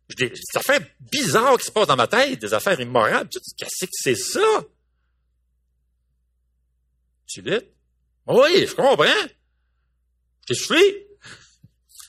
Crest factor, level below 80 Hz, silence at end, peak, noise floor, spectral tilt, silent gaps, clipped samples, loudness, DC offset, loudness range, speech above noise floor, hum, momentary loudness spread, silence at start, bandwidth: 20 dB; -62 dBFS; 0.1 s; -2 dBFS; -69 dBFS; -3 dB/octave; none; under 0.1%; -19 LUFS; under 0.1%; 9 LU; 49 dB; none; 12 LU; 0.1 s; 15.5 kHz